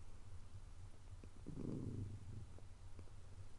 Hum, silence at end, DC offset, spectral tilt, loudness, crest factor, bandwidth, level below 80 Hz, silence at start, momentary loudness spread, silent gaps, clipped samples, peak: none; 0 s; under 0.1%; -7.5 dB/octave; -54 LUFS; 18 dB; 11 kHz; -58 dBFS; 0 s; 12 LU; none; under 0.1%; -32 dBFS